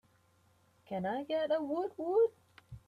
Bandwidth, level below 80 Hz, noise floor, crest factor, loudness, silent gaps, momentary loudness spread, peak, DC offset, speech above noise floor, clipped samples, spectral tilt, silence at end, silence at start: 5.2 kHz; -70 dBFS; -69 dBFS; 16 dB; -34 LUFS; none; 10 LU; -20 dBFS; under 0.1%; 36 dB; under 0.1%; -7.5 dB/octave; 0.1 s; 0.9 s